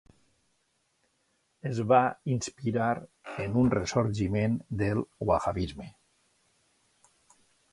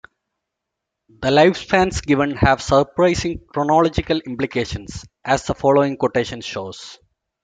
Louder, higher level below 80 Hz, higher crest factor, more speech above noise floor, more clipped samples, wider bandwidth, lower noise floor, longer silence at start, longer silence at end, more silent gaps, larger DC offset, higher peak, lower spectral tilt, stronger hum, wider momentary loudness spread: second, -29 LUFS vs -18 LUFS; second, -52 dBFS vs -40 dBFS; about the same, 22 dB vs 18 dB; second, 46 dB vs 62 dB; neither; first, 11.5 kHz vs 9.4 kHz; second, -74 dBFS vs -81 dBFS; first, 1.65 s vs 1.2 s; first, 1.8 s vs 0.5 s; neither; neither; second, -10 dBFS vs -2 dBFS; about the same, -6.5 dB/octave vs -5.5 dB/octave; neither; about the same, 13 LU vs 14 LU